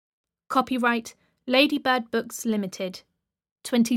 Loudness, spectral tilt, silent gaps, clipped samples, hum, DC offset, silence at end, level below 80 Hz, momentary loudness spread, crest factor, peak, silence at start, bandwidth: -25 LUFS; -3.5 dB/octave; 3.51-3.56 s; under 0.1%; none; under 0.1%; 0 s; -70 dBFS; 19 LU; 20 dB; -6 dBFS; 0.5 s; 16.5 kHz